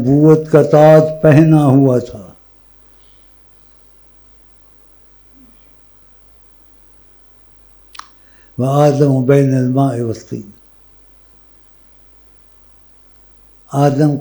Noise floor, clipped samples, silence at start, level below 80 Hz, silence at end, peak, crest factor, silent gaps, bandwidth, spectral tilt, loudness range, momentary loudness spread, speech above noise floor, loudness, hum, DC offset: -44 dBFS; under 0.1%; 0 s; -50 dBFS; 0 s; 0 dBFS; 16 dB; none; over 20 kHz; -8.5 dB/octave; 17 LU; 24 LU; 34 dB; -11 LUFS; none; under 0.1%